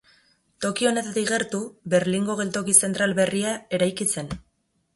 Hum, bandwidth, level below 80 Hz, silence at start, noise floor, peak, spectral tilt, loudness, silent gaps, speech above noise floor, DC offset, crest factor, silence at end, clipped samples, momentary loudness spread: none; 12 kHz; -56 dBFS; 0.6 s; -70 dBFS; -4 dBFS; -3.5 dB/octave; -23 LUFS; none; 47 dB; under 0.1%; 22 dB; 0.55 s; under 0.1%; 12 LU